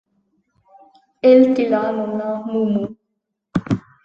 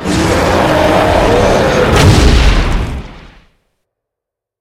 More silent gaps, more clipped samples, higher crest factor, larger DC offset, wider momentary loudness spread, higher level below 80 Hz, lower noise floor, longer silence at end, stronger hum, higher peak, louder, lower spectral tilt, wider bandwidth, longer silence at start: neither; second, under 0.1% vs 0.3%; first, 18 dB vs 10 dB; neither; first, 14 LU vs 9 LU; second, -54 dBFS vs -16 dBFS; second, -76 dBFS vs -81 dBFS; second, 0.25 s vs 1.4 s; neither; about the same, -2 dBFS vs 0 dBFS; second, -18 LUFS vs -10 LUFS; first, -8.5 dB/octave vs -5.5 dB/octave; second, 7.2 kHz vs 16 kHz; first, 1.25 s vs 0 s